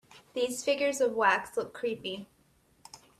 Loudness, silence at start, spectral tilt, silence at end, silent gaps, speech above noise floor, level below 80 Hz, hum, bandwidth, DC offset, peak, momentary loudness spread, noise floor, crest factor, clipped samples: -30 LUFS; 0.15 s; -2.5 dB/octave; 0.25 s; none; 37 dB; -72 dBFS; none; 14.5 kHz; under 0.1%; -10 dBFS; 13 LU; -66 dBFS; 22 dB; under 0.1%